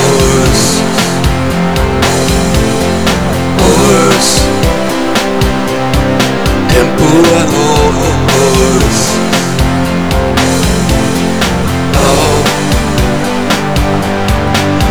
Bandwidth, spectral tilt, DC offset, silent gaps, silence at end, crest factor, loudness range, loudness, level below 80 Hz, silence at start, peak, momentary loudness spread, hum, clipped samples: over 20 kHz; -4.5 dB/octave; 6%; none; 0 s; 10 dB; 2 LU; -10 LUFS; -20 dBFS; 0 s; 0 dBFS; 5 LU; none; 0.4%